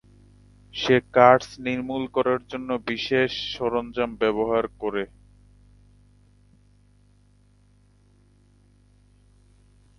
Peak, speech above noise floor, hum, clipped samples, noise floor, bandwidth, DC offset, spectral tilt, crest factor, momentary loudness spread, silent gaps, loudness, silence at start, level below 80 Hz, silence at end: 0 dBFS; 35 dB; 50 Hz at -50 dBFS; under 0.1%; -58 dBFS; 11.5 kHz; under 0.1%; -5.5 dB/octave; 26 dB; 13 LU; none; -23 LUFS; 0.75 s; -56 dBFS; 4.95 s